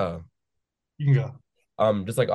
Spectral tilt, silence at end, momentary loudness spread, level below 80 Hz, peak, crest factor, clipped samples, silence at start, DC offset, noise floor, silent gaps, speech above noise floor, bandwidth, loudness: -7.5 dB/octave; 0 s; 12 LU; -58 dBFS; -10 dBFS; 16 dB; under 0.1%; 0 s; under 0.1%; -82 dBFS; none; 59 dB; 12.5 kHz; -25 LUFS